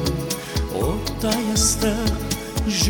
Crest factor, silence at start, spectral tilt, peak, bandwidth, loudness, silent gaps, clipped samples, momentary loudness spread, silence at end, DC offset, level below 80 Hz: 16 dB; 0 s; -4 dB/octave; -6 dBFS; 19.5 kHz; -22 LUFS; none; under 0.1%; 7 LU; 0 s; under 0.1%; -30 dBFS